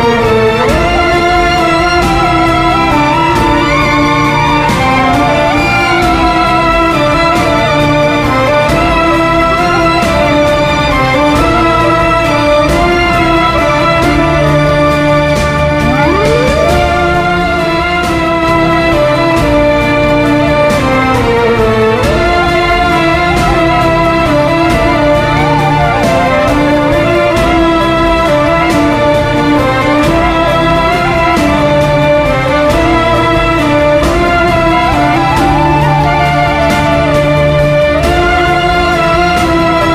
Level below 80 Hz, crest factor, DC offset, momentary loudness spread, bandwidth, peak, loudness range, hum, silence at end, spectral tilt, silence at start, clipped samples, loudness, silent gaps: -22 dBFS; 8 dB; under 0.1%; 1 LU; 16 kHz; 0 dBFS; 1 LU; none; 0 s; -6 dB/octave; 0 s; under 0.1%; -9 LUFS; none